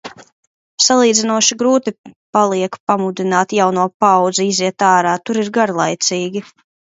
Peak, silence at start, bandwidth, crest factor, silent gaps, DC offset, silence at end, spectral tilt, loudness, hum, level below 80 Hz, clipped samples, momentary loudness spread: 0 dBFS; 0.05 s; 8 kHz; 16 dB; 0.32-0.78 s, 1.98-2.04 s, 2.16-2.33 s, 2.80-2.87 s, 3.94-4.00 s; under 0.1%; 0.45 s; -3 dB/octave; -15 LUFS; none; -66 dBFS; under 0.1%; 7 LU